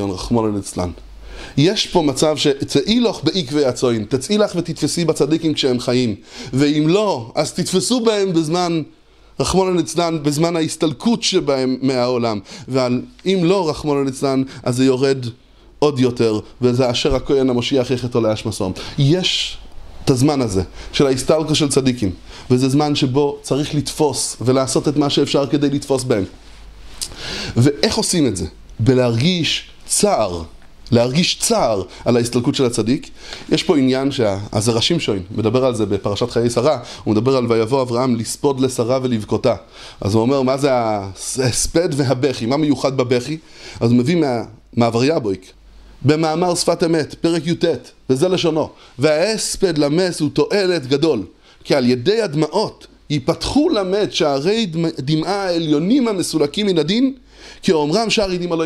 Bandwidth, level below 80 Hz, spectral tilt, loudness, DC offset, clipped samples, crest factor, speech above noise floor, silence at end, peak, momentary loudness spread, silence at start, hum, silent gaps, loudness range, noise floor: 14.5 kHz; -42 dBFS; -5 dB/octave; -18 LUFS; under 0.1%; under 0.1%; 18 dB; 20 dB; 0 s; 0 dBFS; 7 LU; 0 s; none; none; 1 LU; -37 dBFS